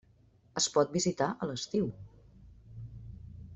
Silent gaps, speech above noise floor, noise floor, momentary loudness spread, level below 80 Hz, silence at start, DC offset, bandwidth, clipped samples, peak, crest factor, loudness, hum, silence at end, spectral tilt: none; 33 dB; -64 dBFS; 21 LU; -58 dBFS; 0.55 s; under 0.1%; 8.2 kHz; under 0.1%; -14 dBFS; 22 dB; -32 LUFS; none; 0 s; -4 dB/octave